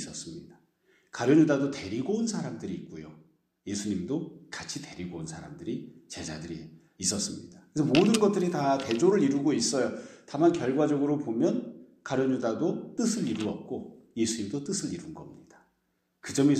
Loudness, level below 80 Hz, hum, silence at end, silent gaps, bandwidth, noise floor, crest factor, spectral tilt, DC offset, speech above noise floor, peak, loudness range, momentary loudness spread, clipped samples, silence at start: -29 LUFS; -66 dBFS; none; 0 s; none; 14 kHz; -76 dBFS; 20 dB; -5 dB/octave; under 0.1%; 48 dB; -8 dBFS; 10 LU; 19 LU; under 0.1%; 0 s